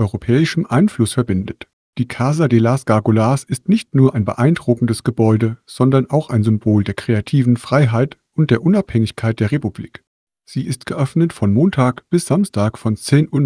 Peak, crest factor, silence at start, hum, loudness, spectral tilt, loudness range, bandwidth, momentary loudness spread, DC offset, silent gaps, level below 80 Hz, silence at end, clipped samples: 0 dBFS; 16 dB; 0 s; none; -16 LUFS; -7.5 dB/octave; 3 LU; 11 kHz; 8 LU; under 0.1%; 1.73-1.93 s, 10.07-10.27 s; -48 dBFS; 0 s; under 0.1%